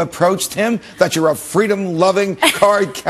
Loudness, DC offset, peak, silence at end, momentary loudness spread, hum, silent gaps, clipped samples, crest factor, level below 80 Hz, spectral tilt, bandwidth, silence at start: -15 LUFS; under 0.1%; 0 dBFS; 0 s; 4 LU; none; none; under 0.1%; 16 dB; -54 dBFS; -4 dB/octave; 13 kHz; 0 s